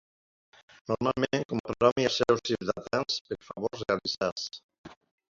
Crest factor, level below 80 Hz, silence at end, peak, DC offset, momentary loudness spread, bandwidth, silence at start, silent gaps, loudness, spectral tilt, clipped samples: 22 dB; -60 dBFS; 0.4 s; -8 dBFS; under 0.1%; 12 LU; 7.6 kHz; 0.9 s; 1.45-1.49 s, 1.60-1.64 s, 1.92-1.96 s, 3.21-3.25 s, 4.32-4.36 s, 4.64-4.69 s, 4.78-4.84 s; -29 LUFS; -4.5 dB/octave; under 0.1%